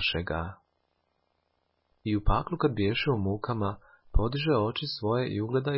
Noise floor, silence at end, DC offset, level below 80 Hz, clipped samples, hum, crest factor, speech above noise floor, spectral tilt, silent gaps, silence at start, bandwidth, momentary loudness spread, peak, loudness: -75 dBFS; 0 s; under 0.1%; -38 dBFS; under 0.1%; none; 20 dB; 47 dB; -10.5 dB/octave; none; 0 s; 5.8 kHz; 7 LU; -10 dBFS; -29 LUFS